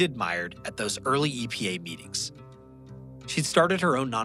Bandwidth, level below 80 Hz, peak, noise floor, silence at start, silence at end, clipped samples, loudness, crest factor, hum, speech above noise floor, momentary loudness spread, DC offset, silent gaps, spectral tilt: 16 kHz; -58 dBFS; -8 dBFS; -47 dBFS; 0 s; 0 s; under 0.1%; -27 LUFS; 20 dB; none; 20 dB; 16 LU; under 0.1%; none; -4 dB/octave